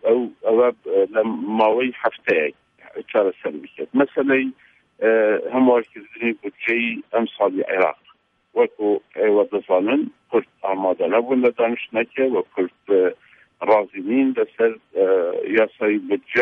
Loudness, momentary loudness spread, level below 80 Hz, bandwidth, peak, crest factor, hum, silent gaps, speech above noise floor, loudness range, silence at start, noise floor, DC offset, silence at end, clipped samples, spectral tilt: -20 LUFS; 7 LU; -74 dBFS; 4.3 kHz; -4 dBFS; 16 dB; none; none; 26 dB; 1 LU; 0.05 s; -45 dBFS; under 0.1%; 0 s; under 0.1%; -7.5 dB/octave